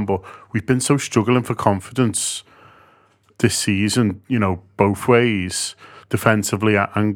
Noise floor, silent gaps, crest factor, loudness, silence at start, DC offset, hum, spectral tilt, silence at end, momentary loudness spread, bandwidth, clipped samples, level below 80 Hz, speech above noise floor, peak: -56 dBFS; none; 20 dB; -19 LUFS; 0 s; under 0.1%; none; -5 dB/octave; 0 s; 8 LU; 18.5 kHz; under 0.1%; -54 dBFS; 37 dB; 0 dBFS